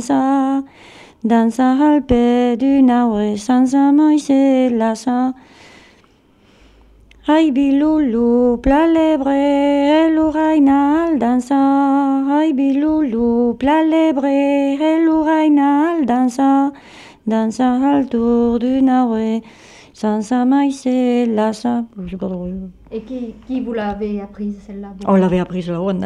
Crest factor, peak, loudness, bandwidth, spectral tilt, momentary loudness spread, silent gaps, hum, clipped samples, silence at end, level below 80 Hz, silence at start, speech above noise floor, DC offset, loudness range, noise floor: 12 dB; -2 dBFS; -15 LUFS; 10.5 kHz; -6.5 dB/octave; 12 LU; none; none; under 0.1%; 0 s; -42 dBFS; 0 s; 37 dB; under 0.1%; 7 LU; -52 dBFS